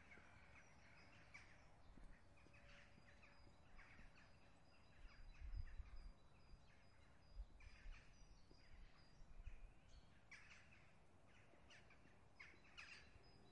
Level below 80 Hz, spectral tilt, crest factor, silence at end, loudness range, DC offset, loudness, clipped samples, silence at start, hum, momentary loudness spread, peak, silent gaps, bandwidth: -64 dBFS; -4.5 dB/octave; 24 dB; 0 s; 4 LU; under 0.1%; -65 LUFS; under 0.1%; 0 s; none; 9 LU; -38 dBFS; none; 10 kHz